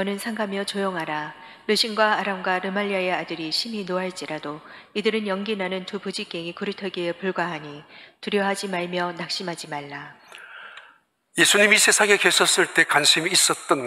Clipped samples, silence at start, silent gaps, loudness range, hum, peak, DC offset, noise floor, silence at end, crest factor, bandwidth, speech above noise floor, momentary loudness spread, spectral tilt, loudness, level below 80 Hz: under 0.1%; 0 s; none; 11 LU; none; -2 dBFS; under 0.1%; -57 dBFS; 0 s; 22 dB; 16 kHz; 33 dB; 20 LU; -2 dB/octave; -22 LUFS; -76 dBFS